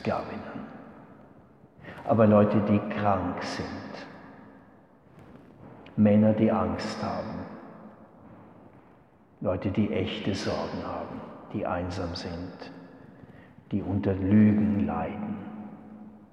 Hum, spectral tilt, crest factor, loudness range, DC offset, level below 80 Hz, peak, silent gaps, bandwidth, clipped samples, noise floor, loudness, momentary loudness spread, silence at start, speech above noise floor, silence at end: none; -8 dB/octave; 20 dB; 8 LU; under 0.1%; -58 dBFS; -8 dBFS; none; 8.2 kHz; under 0.1%; -57 dBFS; -27 LUFS; 25 LU; 0 s; 31 dB; 0.05 s